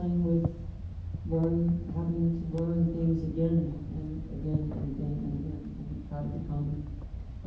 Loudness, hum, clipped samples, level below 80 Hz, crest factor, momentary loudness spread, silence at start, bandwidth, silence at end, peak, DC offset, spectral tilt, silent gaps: -32 LUFS; none; under 0.1%; -40 dBFS; 16 dB; 12 LU; 0 s; 4.1 kHz; 0 s; -14 dBFS; under 0.1%; -11.5 dB/octave; none